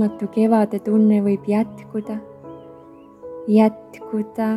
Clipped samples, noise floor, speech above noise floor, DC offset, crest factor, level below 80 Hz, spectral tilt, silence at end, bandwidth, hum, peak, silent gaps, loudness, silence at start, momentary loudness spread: under 0.1%; -44 dBFS; 25 dB; under 0.1%; 18 dB; -64 dBFS; -9 dB/octave; 0 s; 12 kHz; none; -2 dBFS; none; -19 LUFS; 0 s; 23 LU